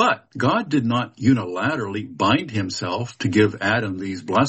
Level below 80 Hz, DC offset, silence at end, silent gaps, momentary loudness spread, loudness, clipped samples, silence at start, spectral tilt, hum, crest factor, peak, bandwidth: -58 dBFS; under 0.1%; 0 s; none; 7 LU; -22 LUFS; under 0.1%; 0 s; -6 dB/octave; none; 16 dB; -4 dBFS; 8.4 kHz